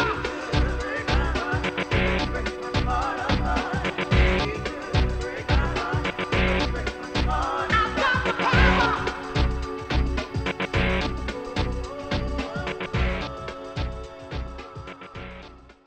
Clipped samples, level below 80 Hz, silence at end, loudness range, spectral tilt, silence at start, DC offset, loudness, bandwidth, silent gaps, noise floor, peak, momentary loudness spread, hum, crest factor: under 0.1%; -30 dBFS; 0.15 s; 7 LU; -5.5 dB/octave; 0 s; under 0.1%; -25 LUFS; 9 kHz; none; -45 dBFS; -6 dBFS; 13 LU; none; 18 dB